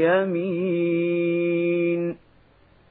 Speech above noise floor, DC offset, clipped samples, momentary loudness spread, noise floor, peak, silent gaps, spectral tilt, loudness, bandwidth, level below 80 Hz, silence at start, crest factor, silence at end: 34 dB; under 0.1%; under 0.1%; 5 LU; -56 dBFS; -8 dBFS; none; -12 dB/octave; -23 LUFS; 4 kHz; -66 dBFS; 0 s; 16 dB; 0.75 s